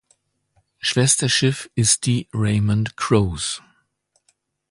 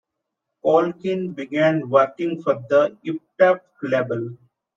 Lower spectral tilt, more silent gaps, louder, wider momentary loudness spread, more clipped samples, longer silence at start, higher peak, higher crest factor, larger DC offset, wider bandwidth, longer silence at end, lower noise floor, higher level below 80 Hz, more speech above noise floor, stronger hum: second, -4 dB/octave vs -7.5 dB/octave; neither; about the same, -19 LUFS vs -21 LUFS; about the same, 9 LU vs 9 LU; neither; first, 0.85 s vs 0.65 s; about the same, -2 dBFS vs -4 dBFS; about the same, 18 dB vs 18 dB; neither; first, 11.5 kHz vs 7.2 kHz; first, 1.1 s vs 0.4 s; second, -67 dBFS vs -80 dBFS; first, -44 dBFS vs -72 dBFS; second, 48 dB vs 60 dB; neither